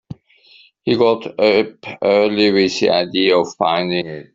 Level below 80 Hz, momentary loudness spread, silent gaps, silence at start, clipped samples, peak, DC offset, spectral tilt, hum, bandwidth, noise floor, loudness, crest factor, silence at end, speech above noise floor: -58 dBFS; 7 LU; none; 0.1 s; under 0.1%; -2 dBFS; under 0.1%; -5 dB/octave; none; 7.8 kHz; -49 dBFS; -16 LUFS; 16 dB; 0.1 s; 33 dB